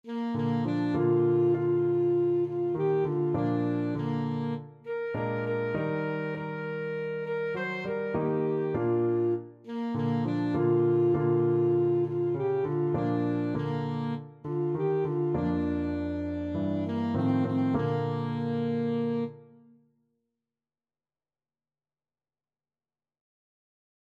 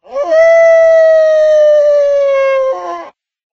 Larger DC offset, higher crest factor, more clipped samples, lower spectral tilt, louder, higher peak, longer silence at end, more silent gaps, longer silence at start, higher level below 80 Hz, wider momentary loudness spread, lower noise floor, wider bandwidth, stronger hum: neither; first, 14 dB vs 8 dB; neither; first, -10 dB/octave vs -2 dB/octave; second, -29 LUFS vs -8 LUFS; second, -14 dBFS vs 0 dBFS; first, 4.7 s vs 0.45 s; neither; about the same, 0.05 s vs 0.1 s; second, -60 dBFS vs -50 dBFS; second, 8 LU vs 11 LU; first, under -90 dBFS vs -30 dBFS; second, 5 kHz vs 6.8 kHz; neither